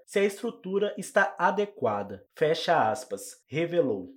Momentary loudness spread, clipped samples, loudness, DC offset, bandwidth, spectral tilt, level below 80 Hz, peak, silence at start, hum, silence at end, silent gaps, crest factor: 11 LU; under 0.1%; -28 LUFS; under 0.1%; 17 kHz; -4.5 dB/octave; -78 dBFS; -10 dBFS; 0.1 s; none; 0.05 s; none; 18 dB